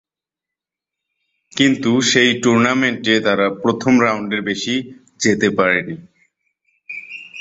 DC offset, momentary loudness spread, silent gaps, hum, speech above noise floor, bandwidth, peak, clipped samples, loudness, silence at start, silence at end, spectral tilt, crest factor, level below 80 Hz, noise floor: under 0.1%; 17 LU; none; none; 70 dB; 8 kHz; 0 dBFS; under 0.1%; -16 LUFS; 1.55 s; 0 s; -4 dB/octave; 18 dB; -58 dBFS; -86 dBFS